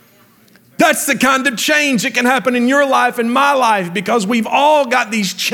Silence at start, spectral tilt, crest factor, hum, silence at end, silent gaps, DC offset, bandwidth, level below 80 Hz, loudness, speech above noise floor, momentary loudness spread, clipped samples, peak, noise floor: 0.8 s; -3 dB/octave; 14 dB; none; 0 s; none; under 0.1%; 19 kHz; -64 dBFS; -13 LUFS; 35 dB; 4 LU; under 0.1%; 0 dBFS; -49 dBFS